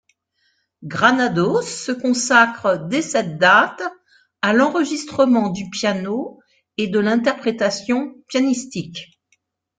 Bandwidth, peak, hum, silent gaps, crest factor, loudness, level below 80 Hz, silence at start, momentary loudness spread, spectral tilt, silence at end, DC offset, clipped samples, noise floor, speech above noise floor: 9.4 kHz; 0 dBFS; none; none; 18 dB; -18 LUFS; -62 dBFS; 0.8 s; 15 LU; -4 dB/octave; 0.75 s; under 0.1%; under 0.1%; -67 dBFS; 48 dB